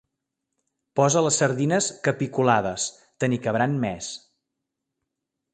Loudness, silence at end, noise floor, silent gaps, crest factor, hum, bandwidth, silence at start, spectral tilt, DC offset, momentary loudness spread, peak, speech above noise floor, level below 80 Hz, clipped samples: -23 LUFS; 1.35 s; -83 dBFS; none; 22 dB; none; 9.6 kHz; 0.95 s; -4.5 dB/octave; under 0.1%; 10 LU; -4 dBFS; 60 dB; -60 dBFS; under 0.1%